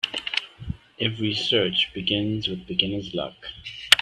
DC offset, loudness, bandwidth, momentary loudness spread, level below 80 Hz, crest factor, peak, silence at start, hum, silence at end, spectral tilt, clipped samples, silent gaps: under 0.1%; -24 LUFS; 16 kHz; 16 LU; -50 dBFS; 26 dB; 0 dBFS; 0.05 s; none; 0 s; -3.5 dB/octave; under 0.1%; none